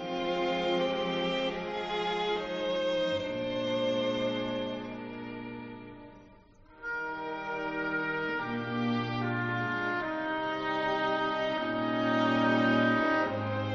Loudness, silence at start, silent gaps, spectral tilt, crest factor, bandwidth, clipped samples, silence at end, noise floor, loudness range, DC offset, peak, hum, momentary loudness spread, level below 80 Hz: -31 LUFS; 0 s; none; -3.5 dB/octave; 18 dB; 7.6 kHz; under 0.1%; 0 s; -56 dBFS; 8 LU; under 0.1%; -14 dBFS; none; 13 LU; -60 dBFS